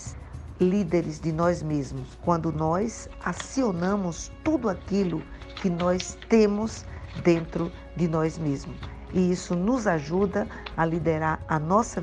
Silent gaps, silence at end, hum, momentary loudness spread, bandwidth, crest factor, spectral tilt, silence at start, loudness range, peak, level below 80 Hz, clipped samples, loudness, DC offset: none; 0 s; none; 9 LU; 9.8 kHz; 18 dB; -6.5 dB/octave; 0 s; 2 LU; -8 dBFS; -44 dBFS; under 0.1%; -26 LUFS; under 0.1%